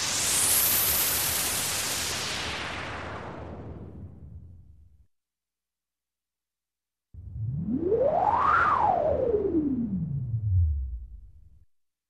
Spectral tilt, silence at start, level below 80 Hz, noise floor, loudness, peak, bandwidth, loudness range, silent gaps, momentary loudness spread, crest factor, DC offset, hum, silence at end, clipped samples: -3 dB/octave; 0 s; -42 dBFS; under -90 dBFS; -25 LUFS; -12 dBFS; 14.5 kHz; 18 LU; none; 20 LU; 18 dB; 0.2%; none; 0.7 s; under 0.1%